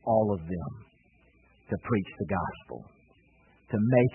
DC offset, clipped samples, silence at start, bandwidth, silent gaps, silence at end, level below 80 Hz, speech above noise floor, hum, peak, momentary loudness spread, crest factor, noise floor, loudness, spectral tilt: under 0.1%; under 0.1%; 0.05 s; 3.2 kHz; none; 0 s; -58 dBFS; 34 dB; none; -8 dBFS; 19 LU; 22 dB; -63 dBFS; -30 LUFS; -12 dB/octave